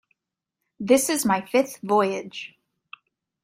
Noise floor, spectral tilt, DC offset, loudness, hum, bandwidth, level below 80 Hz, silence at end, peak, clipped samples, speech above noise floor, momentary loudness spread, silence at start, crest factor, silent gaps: -85 dBFS; -3.5 dB/octave; under 0.1%; -22 LUFS; none; 16 kHz; -68 dBFS; 0.95 s; -6 dBFS; under 0.1%; 62 dB; 17 LU; 0.8 s; 20 dB; none